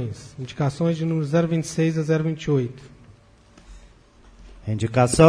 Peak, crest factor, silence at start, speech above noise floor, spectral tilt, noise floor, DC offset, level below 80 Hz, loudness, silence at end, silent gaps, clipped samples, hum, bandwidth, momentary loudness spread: 0 dBFS; 22 dB; 0 s; 31 dB; -6.5 dB/octave; -52 dBFS; under 0.1%; -46 dBFS; -23 LUFS; 0 s; none; under 0.1%; none; 11 kHz; 14 LU